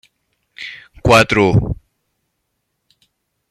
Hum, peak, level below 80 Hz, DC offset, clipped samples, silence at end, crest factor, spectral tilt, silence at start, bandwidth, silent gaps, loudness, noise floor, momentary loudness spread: none; 0 dBFS; -36 dBFS; under 0.1%; under 0.1%; 1.75 s; 18 dB; -5.5 dB/octave; 0.6 s; 14 kHz; none; -13 LUFS; -72 dBFS; 20 LU